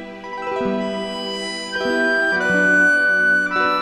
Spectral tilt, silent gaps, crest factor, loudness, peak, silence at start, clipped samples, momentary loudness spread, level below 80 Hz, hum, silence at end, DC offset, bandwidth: -4 dB/octave; none; 12 dB; -18 LUFS; -6 dBFS; 0 s; under 0.1%; 11 LU; -56 dBFS; none; 0 s; under 0.1%; 13.5 kHz